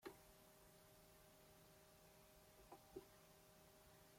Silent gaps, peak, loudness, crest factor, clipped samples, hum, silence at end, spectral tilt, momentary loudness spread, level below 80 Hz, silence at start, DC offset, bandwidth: none; -42 dBFS; -67 LUFS; 24 dB; under 0.1%; none; 0 s; -4 dB/octave; 7 LU; -80 dBFS; 0 s; under 0.1%; 16.5 kHz